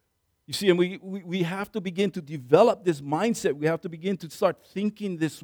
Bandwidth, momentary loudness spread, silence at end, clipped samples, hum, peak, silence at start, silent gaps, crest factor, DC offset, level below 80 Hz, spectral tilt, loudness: over 20 kHz; 11 LU; 0.05 s; under 0.1%; none; -4 dBFS; 0.5 s; none; 22 dB; under 0.1%; -68 dBFS; -5.5 dB/octave; -26 LUFS